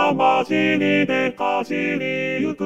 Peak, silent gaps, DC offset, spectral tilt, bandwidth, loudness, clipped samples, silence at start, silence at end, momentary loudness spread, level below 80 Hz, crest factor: -4 dBFS; none; 0.2%; -6 dB/octave; 8.8 kHz; -20 LUFS; under 0.1%; 0 s; 0 s; 5 LU; -68 dBFS; 16 dB